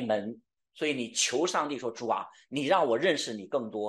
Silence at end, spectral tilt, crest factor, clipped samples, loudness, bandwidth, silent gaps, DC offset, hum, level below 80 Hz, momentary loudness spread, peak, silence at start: 0 s; -3 dB/octave; 18 dB; under 0.1%; -29 LUFS; 12.5 kHz; none; under 0.1%; none; -80 dBFS; 8 LU; -12 dBFS; 0 s